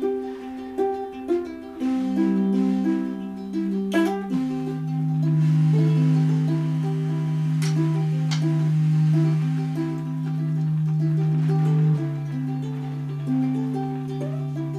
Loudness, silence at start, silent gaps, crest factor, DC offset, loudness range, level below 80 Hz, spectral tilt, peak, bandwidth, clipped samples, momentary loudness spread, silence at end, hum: -23 LUFS; 0 s; none; 12 dB; under 0.1%; 3 LU; -60 dBFS; -8.5 dB/octave; -10 dBFS; 8.2 kHz; under 0.1%; 9 LU; 0 s; none